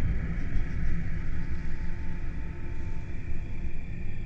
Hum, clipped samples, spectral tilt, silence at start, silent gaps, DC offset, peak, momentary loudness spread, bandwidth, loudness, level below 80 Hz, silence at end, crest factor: none; under 0.1%; -8 dB/octave; 0 s; none; under 0.1%; -14 dBFS; 5 LU; 3.4 kHz; -36 LUFS; -30 dBFS; 0 s; 12 dB